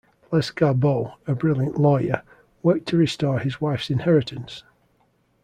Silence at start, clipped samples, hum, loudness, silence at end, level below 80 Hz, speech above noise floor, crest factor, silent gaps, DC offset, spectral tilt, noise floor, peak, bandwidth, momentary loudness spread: 0.3 s; under 0.1%; none; -22 LUFS; 0.85 s; -56 dBFS; 43 dB; 18 dB; none; under 0.1%; -7.5 dB/octave; -64 dBFS; -4 dBFS; 10 kHz; 9 LU